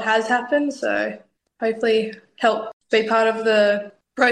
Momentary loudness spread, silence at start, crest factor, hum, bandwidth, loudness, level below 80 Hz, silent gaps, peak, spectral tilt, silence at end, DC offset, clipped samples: 10 LU; 0 s; 16 dB; none; 10 kHz; -20 LUFS; -68 dBFS; 2.73-2.80 s; -4 dBFS; -4 dB/octave; 0 s; under 0.1%; under 0.1%